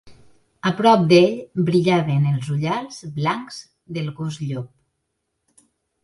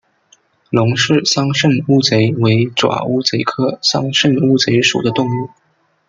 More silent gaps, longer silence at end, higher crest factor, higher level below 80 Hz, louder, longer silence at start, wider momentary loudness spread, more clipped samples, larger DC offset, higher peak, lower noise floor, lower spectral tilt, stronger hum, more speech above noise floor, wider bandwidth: neither; first, 1.35 s vs 0.6 s; first, 20 dB vs 14 dB; second, -60 dBFS vs -54 dBFS; second, -20 LUFS vs -14 LUFS; second, 0.05 s vs 0.7 s; first, 17 LU vs 5 LU; neither; neither; about the same, -2 dBFS vs 0 dBFS; first, -75 dBFS vs -54 dBFS; first, -7 dB/octave vs -5 dB/octave; neither; first, 56 dB vs 40 dB; first, 11.5 kHz vs 9.2 kHz